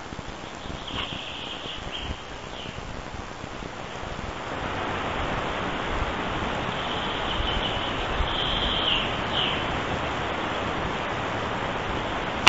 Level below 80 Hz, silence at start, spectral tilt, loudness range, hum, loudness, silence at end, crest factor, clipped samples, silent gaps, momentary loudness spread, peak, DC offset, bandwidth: -40 dBFS; 0 s; -4.5 dB/octave; 8 LU; none; -28 LUFS; 0 s; 28 dB; under 0.1%; none; 12 LU; 0 dBFS; 0.4%; 8 kHz